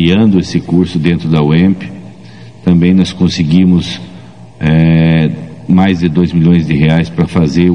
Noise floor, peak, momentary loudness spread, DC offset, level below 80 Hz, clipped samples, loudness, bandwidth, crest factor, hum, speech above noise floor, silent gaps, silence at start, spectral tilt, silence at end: -33 dBFS; 0 dBFS; 10 LU; 0.9%; -36 dBFS; 0.4%; -10 LUFS; 9.2 kHz; 10 dB; none; 24 dB; none; 0 s; -7.5 dB/octave; 0 s